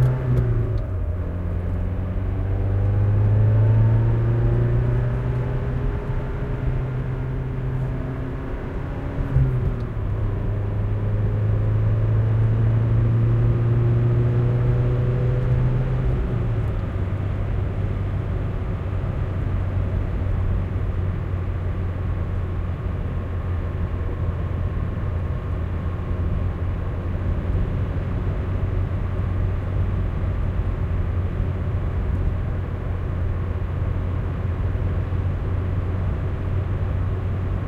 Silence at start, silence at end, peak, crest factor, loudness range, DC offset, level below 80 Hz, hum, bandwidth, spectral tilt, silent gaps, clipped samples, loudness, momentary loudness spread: 0 s; 0 s; -6 dBFS; 14 dB; 6 LU; under 0.1%; -28 dBFS; none; 4.3 kHz; -10 dB/octave; none; under 0.1%; -24 LUFS; 7 LU